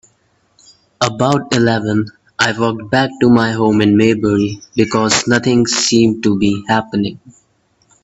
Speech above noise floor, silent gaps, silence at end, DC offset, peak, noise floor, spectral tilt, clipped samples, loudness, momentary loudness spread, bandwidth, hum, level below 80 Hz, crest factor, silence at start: 45 dB; none; 0.75 s; under 0.1%; 0 dBFS; -58 dBFS; -4.5 dB/octave; under 0.1%; -14 LUFS; 7 LU; 8.4 kHz; none; -48 dBFS; 14 dB; 1 s